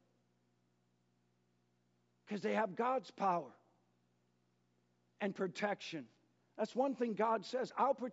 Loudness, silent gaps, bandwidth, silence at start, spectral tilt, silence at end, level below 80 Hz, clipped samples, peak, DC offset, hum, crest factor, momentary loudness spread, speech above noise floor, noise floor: -39 LUFS; none; 7.6 kHz; 2.25 s; -4 dB/octave; 0 s; under -90 dBFS; under 0.1%; -22 dBFS; under 0.1%; 60 Hz at -75 dBFS; 20 dB; 8 LU; 41 dB; -78 dBFS